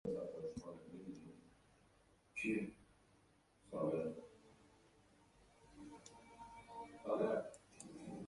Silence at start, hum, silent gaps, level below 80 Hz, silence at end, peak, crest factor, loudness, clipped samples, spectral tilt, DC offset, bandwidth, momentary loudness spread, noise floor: 0.05 s; none; none; -74 dBFS; 0 s; -28 dBFS; 20 dB; -45 LUFS; under 0.1%; -6.5 dB/octave; under 0.1%; 11.5 kHz; 20 LU; -73 dBFS